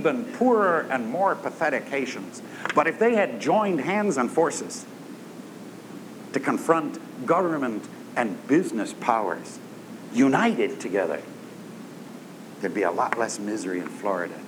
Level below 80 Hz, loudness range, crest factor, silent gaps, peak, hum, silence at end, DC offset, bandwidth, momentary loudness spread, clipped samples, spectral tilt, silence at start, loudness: -86 dBFS; 4 LU; 22 dB; none; -4 dBFS; none; 0 s; under 0.1%; 19.5 kHz; 19 LU; under 0.1%; -5 dB/octave; 0 s; -25 LUFS